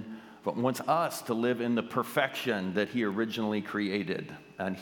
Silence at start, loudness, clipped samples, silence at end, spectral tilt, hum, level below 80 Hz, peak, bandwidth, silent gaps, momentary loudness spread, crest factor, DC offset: 0 s; -31 LUFS; under 0.1%; 0 s; -5.5 dB/octave; none; -76 dBFS; -10 dBFS; 19 kHz; none; 8 LU; 20 dB; under 0.1%